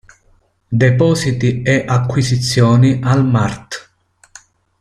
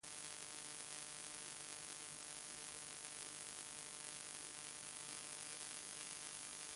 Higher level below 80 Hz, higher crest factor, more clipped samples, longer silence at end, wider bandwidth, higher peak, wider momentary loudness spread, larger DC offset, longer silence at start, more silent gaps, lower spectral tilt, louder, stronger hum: first, -44 dBFS vs -82 dBFS; second, 14 dB vs 24 dB; neither; first, 1 s vs 0 s; about the same, 11.5 kHz vs 11.5 kHz; first, -2 dBFS vs -28 dBFS; first, 10 LU vs 1 LU; neither; first, 0.7 s vs 0.05 s; neither; first, -6 dB/octave vs 0 dB/octave; first, -14 LUFS vs -49 LUFS; neither